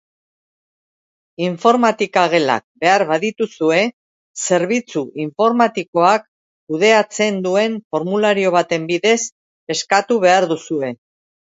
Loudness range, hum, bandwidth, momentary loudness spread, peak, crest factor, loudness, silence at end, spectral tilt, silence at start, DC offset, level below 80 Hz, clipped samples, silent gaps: 1 LU; none; 8 kHz; 10 LU; 0 dBFS; 18 dB; -17 LUFS; 0.55 s; -4 dB/octave; 1.4 s; under 0.1%; -68 dBFS; under 0.1%; 2.64-2.75 s, 3.93-4.34 s, 5.88-5.93 s, 6.28-6.67 s, 7.84-7.90 s, 9.32-9.67 s